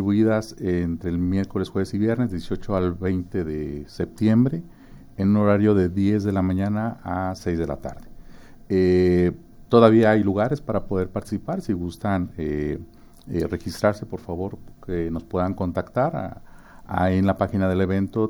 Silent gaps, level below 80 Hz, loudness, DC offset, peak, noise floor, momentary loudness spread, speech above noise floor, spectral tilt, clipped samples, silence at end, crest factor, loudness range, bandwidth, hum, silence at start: none; -44 dBFS; -23 LUFS; under 0.1%; 0 dBFS; -43 dBFS; 12 LU; 21 dB; -8.5 dB/octave; under 0.1%; 0 s; 22 dB; 7 LU; over 20 kHz; none; 0 s